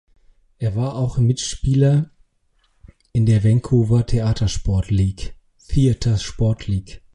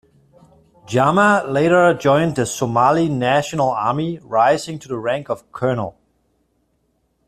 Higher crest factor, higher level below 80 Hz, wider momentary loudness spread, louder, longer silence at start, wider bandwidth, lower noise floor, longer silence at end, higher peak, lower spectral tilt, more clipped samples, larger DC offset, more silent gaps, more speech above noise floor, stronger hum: about the same, 14 dB vs 16 dB; first, -32 dBFS vs -54 dBFS; about the same, 9 LU vs 10 LU; second, -20 LUFS vs -17 LUFS; second, 0.6 s vs 0.9 s; second, 11 kHz vs 14 kHz; about the same, -63 dBFS vs -66 dBFS; second, 0.15 s vs 1.35 s; about the same, -4 dBFS vs -2 dBFS; first, -7 dB/octave vs -5.5 dB/octave; neither; neither; neither; second, 45 dB vs 49 dB; neither